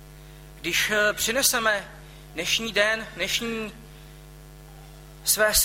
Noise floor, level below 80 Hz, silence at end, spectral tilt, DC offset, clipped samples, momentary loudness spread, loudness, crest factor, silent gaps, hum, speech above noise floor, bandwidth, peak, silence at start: -45 dBFS; -46 dBFS; 0 s; -1 dB/octave; under 0.1%; under 0.1%; 14 LU; -23 LUFS; 20 dB; none; none; 21 dB; 16.5 kHz; -6 dBFS; 0 s